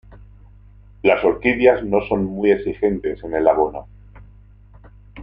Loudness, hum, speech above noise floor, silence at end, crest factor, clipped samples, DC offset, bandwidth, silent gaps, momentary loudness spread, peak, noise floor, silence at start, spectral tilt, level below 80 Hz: -18 LUFS; 50 Hz at -40 dBFS; 28 dB; 0 s; 20 dB; under 0.1%; under 0.1%; 5 kHz; none; 8 LU; 0 dBFS; -46 dBFS; 0.1 s; -9 dB/octave; -44 dBFS